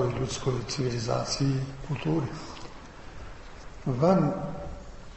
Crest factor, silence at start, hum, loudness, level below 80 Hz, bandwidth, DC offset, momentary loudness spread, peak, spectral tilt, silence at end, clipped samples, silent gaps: 20 dB; 0 s; none; -29 LUFS; -46 dBFS; 8.4 kHz; under 0.1%; 21 LU; -10 dBFS; -6 dB/octave; 0 s; under 0.1%; none